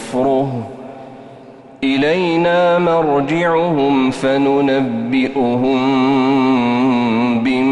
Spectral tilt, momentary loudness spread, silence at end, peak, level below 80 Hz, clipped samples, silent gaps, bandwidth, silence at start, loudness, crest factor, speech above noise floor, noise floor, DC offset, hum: -6.5 dB/octave; 9 LU; 0 s; -6 dBFS; -52 dBFS; under 0.1%; none; 11 kHz; 0 s; -15 LUFS; 10 dB; 24 dB; -38 dBFS; under 0.1%; none